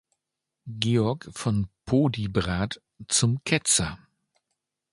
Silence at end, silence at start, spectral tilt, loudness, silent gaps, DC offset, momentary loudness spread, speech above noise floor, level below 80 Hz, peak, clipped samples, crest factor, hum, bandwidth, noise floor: 0.95 s; 0.65 s; -4 dB/octave; -25 LUFS; none; under 0.1%; 10 LU; 60 dB; -48 dBFS; -6 dBFS; under 0.1%; 22 dB; none; 11.5 kHz; -85 dBFS